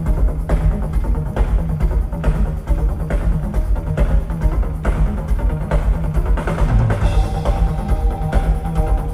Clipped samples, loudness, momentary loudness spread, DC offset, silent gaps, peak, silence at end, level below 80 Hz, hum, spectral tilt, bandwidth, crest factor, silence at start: under 0.1%; -20 LUFS; 3 LU; under 0.1%; none; -4 dBFS; 0 s; -18 dBFS; none; -8 dB/octave; 11 kHz; 12 dB; 0 s